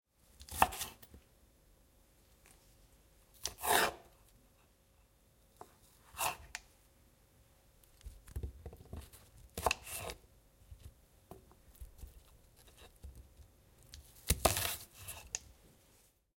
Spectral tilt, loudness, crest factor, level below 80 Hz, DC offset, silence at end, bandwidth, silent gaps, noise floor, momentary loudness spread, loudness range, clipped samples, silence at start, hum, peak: -2 dB/octave; -37 LUFS; 34 dB; -56 dBFS; under 0.1%; 0.85 s; 16.5 kHz; none; -69 dBFS; 27 LU; 15 LU; under 0.1%; 0.4 s; none; -8 dBFS